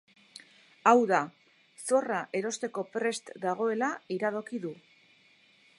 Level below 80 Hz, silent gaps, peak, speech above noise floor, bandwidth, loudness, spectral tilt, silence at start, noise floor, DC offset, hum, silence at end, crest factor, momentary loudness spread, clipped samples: -86 dBFS; none; -6 dBFS; 34 dB; 11.5 kHz; -30 LUFS; -4 dB/octave; 0.85 s; -63 dBFS; under 0.1%; none; 1.05 s; 24 dB; 17 LU; under 0.1%